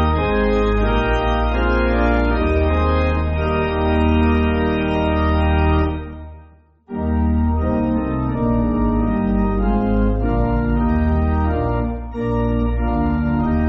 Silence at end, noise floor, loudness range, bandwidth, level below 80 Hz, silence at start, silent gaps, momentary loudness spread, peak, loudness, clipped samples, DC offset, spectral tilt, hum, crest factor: 0 s; -47 dBFS; 2 LU; 5.6 kHz; -22 dBFS; 0 s; none; 5 LU; -4 dBFS; -19 LUFS; under 0.1%; under 0.1%; -7 dB/octave; none; 14 dB